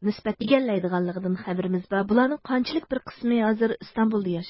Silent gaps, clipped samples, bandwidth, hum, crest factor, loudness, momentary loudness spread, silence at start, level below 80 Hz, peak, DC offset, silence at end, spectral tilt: none; under 0.1%; 5.8 kHz; none; 18 dB; -25 LUFS; 7 LU; 0 s; -58 dBFS; -6 dBFS; under 0.1%; 0 s; -11 dB/octave